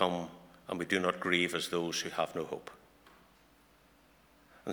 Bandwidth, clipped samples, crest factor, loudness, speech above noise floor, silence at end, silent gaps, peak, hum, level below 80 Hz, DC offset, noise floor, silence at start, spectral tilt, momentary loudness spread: over 20 kHz; under 0.1%; 24 dB; -34 LUFS; 30 dB; 0 s; none; -12 dBFS; none; -70 dBFS; under 0.1%; -64 dBFS; 0 s; -3.5 dB/octave; 17 LU